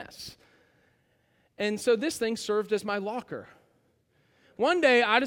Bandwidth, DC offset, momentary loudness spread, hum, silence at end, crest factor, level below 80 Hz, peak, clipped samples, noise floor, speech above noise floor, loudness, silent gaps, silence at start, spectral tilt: 17 kHz; under 0.1%; 20 LU; none; 0 s; 22 dB; -70 dBFS; -6 dBFS; under 0.1%; -69 dBFS; 42 dB; -27 LUFS; none; 0 s; -3.5 dB/octave